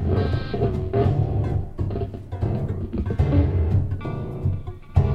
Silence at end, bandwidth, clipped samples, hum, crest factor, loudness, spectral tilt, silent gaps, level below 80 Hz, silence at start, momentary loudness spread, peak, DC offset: 0 s; 5.2 kHz; under 0.1%; none; 18 dB; -24 LUFS; -10 dB/octave; none; -30 dBFS; 0 s; 8 LU; -4 dBFS; under 0.1%